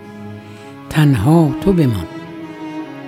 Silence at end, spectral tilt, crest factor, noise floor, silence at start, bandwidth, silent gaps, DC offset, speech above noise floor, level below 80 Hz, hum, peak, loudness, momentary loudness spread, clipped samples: 0 s; -8 dB/octave; 16 dB; -35 dBFS; 0 s; 15.5 kHz; none; under 0.1%; 22 dB; -40 dBFS; none; 0 dBFS; -14 LUFS; 21 LU; under 0.1%